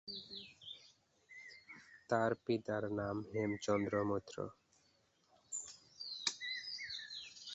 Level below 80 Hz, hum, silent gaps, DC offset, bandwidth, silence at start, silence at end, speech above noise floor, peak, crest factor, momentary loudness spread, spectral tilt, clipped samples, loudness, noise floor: -72 dBFS; none; none; under 0.1%; 8 kHz; 0.05 s; 0 s; 37 dB; -18 dBFS; 24 dB; 18 LU; -3.5 dB/octave; under 0.1%; -41 LUFS; -75 dBFS